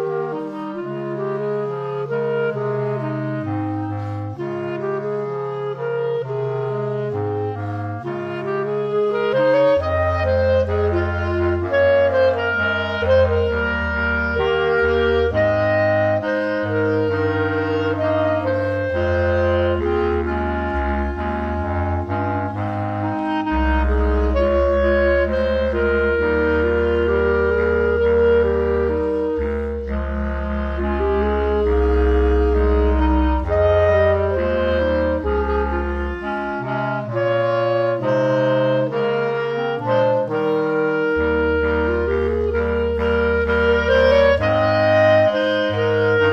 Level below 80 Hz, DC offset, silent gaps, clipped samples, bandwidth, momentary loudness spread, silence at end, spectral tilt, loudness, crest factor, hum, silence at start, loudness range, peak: -28 dBFS; under 0.1%; none; under 0.1%; 6.6 kHz; 8 LU; 0 s; -8 dB/octave; -19 LUFS; 14 dB; none; 0 s; 6 LU; -4 dBFS